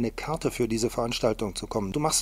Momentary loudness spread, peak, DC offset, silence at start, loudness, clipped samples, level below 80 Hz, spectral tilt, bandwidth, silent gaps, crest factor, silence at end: 4 LU; -10 dBFS; under 0.1%; 0 s; -28 LUFS; under 0.1%; -44 dBFS; -4 dB/octave; 16 kHz; none; 18 dB; 0 s